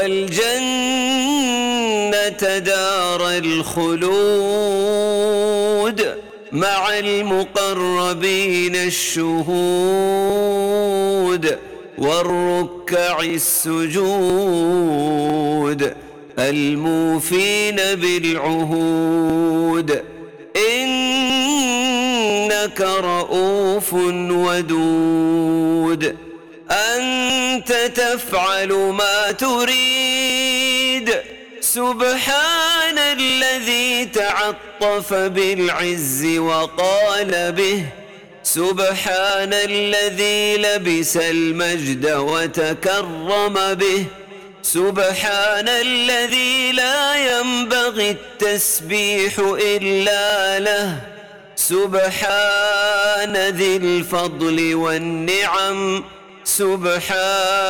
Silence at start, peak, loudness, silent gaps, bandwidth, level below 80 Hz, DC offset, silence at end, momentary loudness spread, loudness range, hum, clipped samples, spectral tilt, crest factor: 0 s; -8 dBFS; -17 LUFS; none; 19 kHz; -54 dBFS; 0.3%; 0 s; 5 LU; 2 LU; none; under 0.1%; -3 dB/octave; 10 dB